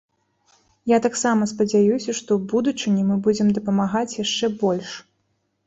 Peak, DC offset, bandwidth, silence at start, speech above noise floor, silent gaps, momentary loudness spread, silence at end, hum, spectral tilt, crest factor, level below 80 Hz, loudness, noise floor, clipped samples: -6 dBFS; under 0.1%; 8 kHz; 0.85 s; 50 dB; none; 6 LU; 0.65 s; none; -5 dB/octave; 14 dB; -62 dBFS; -21 LUFS; -71 dBFS; under 0.1%